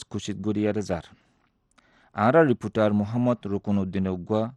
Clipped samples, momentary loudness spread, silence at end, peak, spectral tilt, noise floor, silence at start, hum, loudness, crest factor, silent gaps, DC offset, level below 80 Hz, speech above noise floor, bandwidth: under 0.1%; 12 LU; 0 s; -6 dBFS; -7.5 dB/octave; -67 dBFS; 0 s; none; -25 LUFS; 18 dB; none; under 0.1%; -58 dBFS; 43 dB; 9.8 kHz